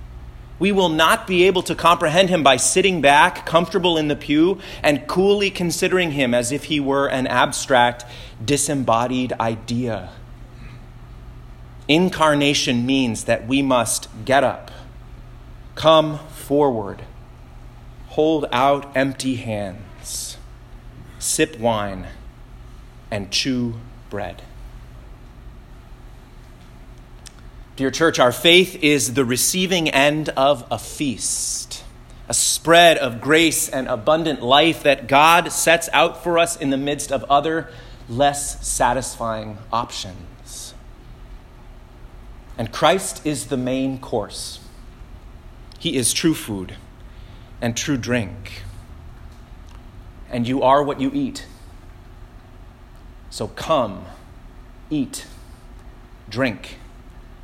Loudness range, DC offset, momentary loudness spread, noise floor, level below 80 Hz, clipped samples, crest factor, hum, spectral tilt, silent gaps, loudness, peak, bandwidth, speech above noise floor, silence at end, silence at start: 12 LU; under 0.1%; 19 LU; -42 dBFS; -42 dBFS; under 0.1%; 20 dB; none; -3.5 dB/octave; none; -18 LUFS; 0 dBFS; 16.5 kHz; 23 dB; 0 s; 0 s